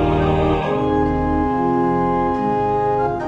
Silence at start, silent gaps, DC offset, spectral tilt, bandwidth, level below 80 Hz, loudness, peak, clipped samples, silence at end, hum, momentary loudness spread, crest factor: 0 s; none; under 0.1%; -9 dB/octave; 7.8 kHz; -32 dBFS; -18 LUFS; -6 dBFS; under 0.1%; 0 s; none; 2 LU; 12 dB